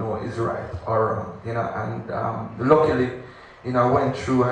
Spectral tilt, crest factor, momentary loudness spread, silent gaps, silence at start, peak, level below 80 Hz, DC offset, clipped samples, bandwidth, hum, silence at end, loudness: -8 dB/octave; 20 dB; 11 LU; none; 0 s; -2 dBFS; -50 dBFS; under 0.1%; under 0.1%; 9.4 kHz; none; 0 s; -23 LUFS